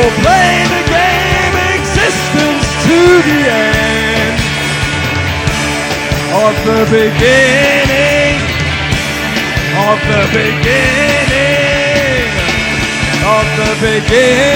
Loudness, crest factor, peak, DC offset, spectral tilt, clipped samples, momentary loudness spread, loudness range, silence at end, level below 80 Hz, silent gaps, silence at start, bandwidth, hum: -10 LUFS; 10 dB; 0 dBFS; under 0.1%; -4.5 dB/octave; under 0.1%; 6 LU; 2 LU; 0 s; -26 dBFS; none; 0 s; 19 kHz; none